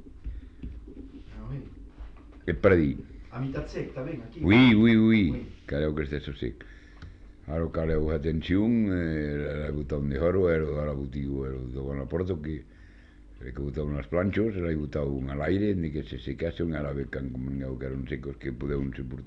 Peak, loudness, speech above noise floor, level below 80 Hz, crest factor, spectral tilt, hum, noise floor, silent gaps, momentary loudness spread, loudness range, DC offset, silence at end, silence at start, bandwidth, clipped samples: -8 dBFS; -28 LUFS; 24 dB; -40 dBFS; 20 dB; -9 dB/octave; none; -51 dBFS; none; 21 LU; 8 LU; under 0.1%; 0 s; 0 s; 6.2 kHz; under 0.1%